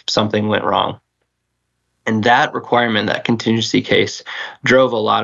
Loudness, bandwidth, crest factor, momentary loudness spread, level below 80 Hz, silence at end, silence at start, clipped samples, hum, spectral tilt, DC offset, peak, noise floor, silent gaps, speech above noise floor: -16 LUFS; 7.8 kHz; 16 dB; 8 LU; -54 dBFS; 0 s; 0.1 s; under 0.1%; 60 Hz at -40 dBFS; -4.5 dB/octave; under 0.1%; -2 dBFS; -72 dBFS; none; 56 dB